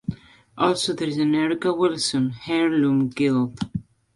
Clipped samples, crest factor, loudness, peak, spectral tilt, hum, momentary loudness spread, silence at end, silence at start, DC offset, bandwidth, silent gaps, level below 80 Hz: under 0.1%; 16 dB; -22 LUFS; -6 dBFS; -5 dB/octave; none; 9 LU; 0.35 s; 0.1 s; under 0.1%; 11.5 kHz; none; -56 dBFS